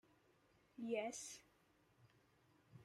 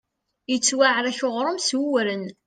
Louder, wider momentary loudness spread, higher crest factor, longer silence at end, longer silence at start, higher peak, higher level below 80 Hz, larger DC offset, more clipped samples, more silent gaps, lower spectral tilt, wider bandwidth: second, -48 LUFS vs -22 LUFS; first, 20 LU vs 9 LU; about the same, 22 dB vs 18 dB; second, 0 s vs 0.15 s; first, 0.75 s vs 0.5 s; second, -30 dBFS vs -6 dBFS; second, -88 dBFS vs -74 dBFS; neither; neither; neither; about the same, -3 dB/octave vs -2 dB/octave; first, 16 kHz vs 10 kHz